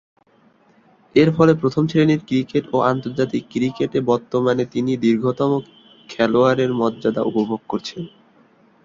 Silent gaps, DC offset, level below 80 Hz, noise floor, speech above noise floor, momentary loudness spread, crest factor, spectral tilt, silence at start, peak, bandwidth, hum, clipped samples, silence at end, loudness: none; under 0.1%; -56 dBFS; -56 dBFS; 38 dB; 9 LU; 18 dB; -7.5 dB/octave; 1.15 s; -2 dBFS; 7.6 kHz; none; under 0.1%; 0.8 s; -19 LUFS